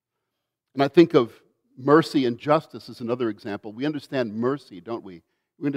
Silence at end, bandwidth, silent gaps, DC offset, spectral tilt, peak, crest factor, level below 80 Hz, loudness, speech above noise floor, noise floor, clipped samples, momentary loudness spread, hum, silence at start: 0 s; 12 kHz; none; under 0.1%; -7 dB/octave; -4 dBFS; 20 dB; -72 dBFS; -23 LUFS; 59 dB; -82 dBFS; under 0.1%; 17 LU; none; 0.75 s